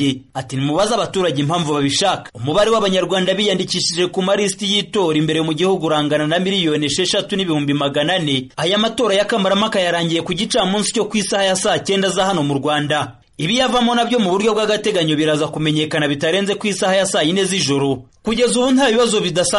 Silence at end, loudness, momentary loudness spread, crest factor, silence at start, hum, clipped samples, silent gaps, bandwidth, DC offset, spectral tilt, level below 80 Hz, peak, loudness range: 0 s; -17 LUFS; 4 LU; 12 dB; 0 s; none; under 0.1%; none; 11.5 kHz; under 0.1%; -4 dB/octave; -50 dBFS; -4 dBFS; 1 LU